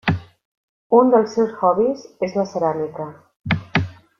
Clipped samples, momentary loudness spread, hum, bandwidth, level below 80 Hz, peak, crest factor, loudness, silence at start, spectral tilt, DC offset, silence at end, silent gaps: under 0.1%; 13 LU; none; 7.2 kHz; -52 dBFS; -2 dBFS; 18 dB; -20 LUFS; 0.05 s; -7 dB/octave; under 0.1%; 0.25 s; 0.45-0.90 s